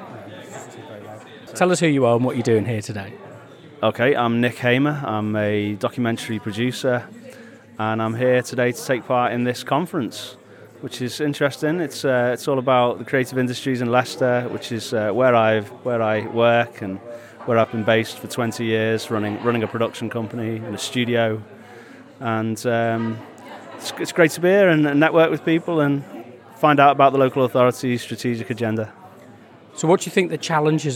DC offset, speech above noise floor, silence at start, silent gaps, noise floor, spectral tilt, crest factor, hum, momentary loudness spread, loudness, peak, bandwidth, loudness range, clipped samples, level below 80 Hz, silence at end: under 0.1%; 25 dB; 0 s; none; -45 dBFS; -5.5 dB/octave; 20 dB; none; 19 LU; -20 LUFS; 0 dBFS; 18 kHz; 6 LU; under 0.1%; -74 dBFS; 0 s